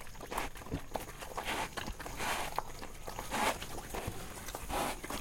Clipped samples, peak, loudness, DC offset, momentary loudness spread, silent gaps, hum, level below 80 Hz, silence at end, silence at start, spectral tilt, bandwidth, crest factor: under 0.1%; -16 dBFS; -39 LUFS; under 0.1%; 9 LU; none; none; -48 dBFS; 0 s; 0 s; -3 dB/octave; 17 kHz; 22 dB